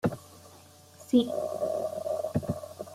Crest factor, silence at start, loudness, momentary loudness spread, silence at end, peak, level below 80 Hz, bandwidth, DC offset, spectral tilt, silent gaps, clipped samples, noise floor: 20 dB; 0.05 s; -30 LUFS; 23 LU; 0 s; -12 dBFS; -62 dBFS; 15.5 kHz; under 0.1%; -7 dB/octave; none; under 0.1%; -54 dBFS